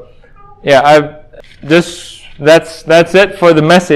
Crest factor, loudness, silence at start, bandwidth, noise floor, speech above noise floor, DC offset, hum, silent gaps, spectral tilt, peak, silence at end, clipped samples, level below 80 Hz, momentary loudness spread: 10 dB; -8 LUFS; 0.65 s; 16 kHz; -37 dBFS; 29 dB; under 0.1%; none; none; -5 dB/octave; 0 dBFS; 0 s; 2%; -42 dBFS; 16 LU